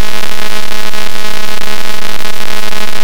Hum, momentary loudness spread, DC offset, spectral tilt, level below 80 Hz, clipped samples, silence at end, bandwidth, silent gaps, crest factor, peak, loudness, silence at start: none; 1 LU; 100%; -2.5 dB/octave; -40 dBFS; 50%; 0 s; over 20 kHz; none; 22 dB; 0 dBFS; -19 LUFS; 0 s